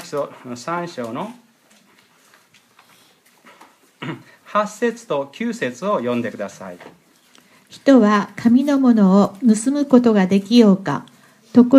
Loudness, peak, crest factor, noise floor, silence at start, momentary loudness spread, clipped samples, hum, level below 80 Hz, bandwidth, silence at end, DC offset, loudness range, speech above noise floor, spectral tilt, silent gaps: -17 LUFS; 0 dBFS; 18 dB; -54 dBFS; 0 s; 18 LU; under 0.1%; none; -68 dBFS; 12 kHz; 0 s; under 0.1%; 17 LU; 37 dB; -6.5 dB/octave; none